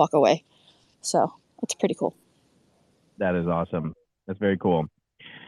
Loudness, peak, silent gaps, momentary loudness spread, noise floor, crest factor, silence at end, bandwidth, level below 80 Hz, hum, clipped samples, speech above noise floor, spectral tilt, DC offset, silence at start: -26 LUFS; -6 dBFS; none; 14 LU; -64 dBFS; 22 dB; 0.1 s; 12.5 kHz; -64 dBFS; none; under 0.1%; 40 dB; -5.5 dB/octave; under 0.1%; 0 s